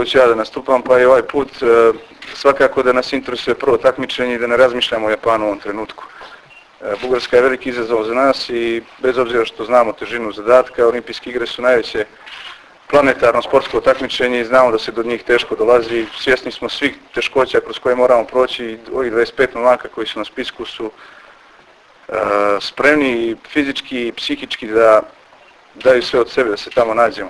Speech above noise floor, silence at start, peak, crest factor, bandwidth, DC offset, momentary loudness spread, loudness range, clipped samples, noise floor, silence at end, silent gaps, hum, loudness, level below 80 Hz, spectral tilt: 31 dB; 0 s; 0 dBFS; 16 dB; 11 kHz; under 0.1%; 12 LU; 4 LU; under 0.1%; -46 dBFS; 0 s; none; none; -15 LUFS; -48 dBFS; -4.5 dB/octave